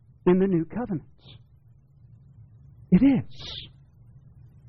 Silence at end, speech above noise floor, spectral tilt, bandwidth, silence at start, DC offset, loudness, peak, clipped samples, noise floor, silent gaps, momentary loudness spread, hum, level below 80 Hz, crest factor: 1 s; 32 dB; -7.5 dB/octave; 6.2 kHz; 0.25 s; under 0.1%; -24 LUFS; -8 dBFS; under 0.1%; -56 dBFS; none; 17 LU; none; -52 dBFS; 18 dB